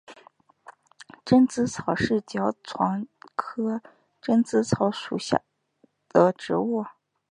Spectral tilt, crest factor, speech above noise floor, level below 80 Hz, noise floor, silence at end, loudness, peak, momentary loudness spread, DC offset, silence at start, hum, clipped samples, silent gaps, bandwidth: -6 dB/octave; 24 dB; 41 dB; -60 dBFS; -65 dBFS; 0.45 s; -25 LUFS; -2 dBFS; 12 LU; under 0.1%; 0.1 s; none; under 0.1%; none; 10.5 kHz